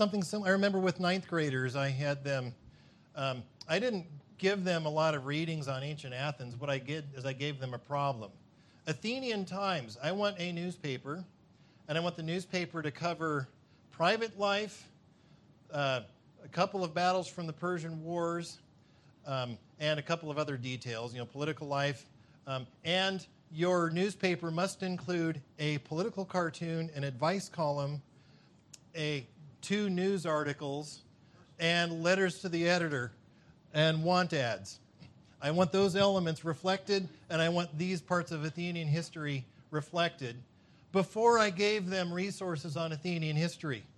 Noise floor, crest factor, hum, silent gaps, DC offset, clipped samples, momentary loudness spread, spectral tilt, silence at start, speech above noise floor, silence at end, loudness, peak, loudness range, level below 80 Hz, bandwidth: -62 dBFS; 22 dB; none; none; under 0.1%; under 0.1%; 12 LU; -5.5 dB/octave; 0 s; 29 dB; 0.1 s; -34 LUFS; -12 dBFS; 5 LU; -74 dBFS; 12 kHz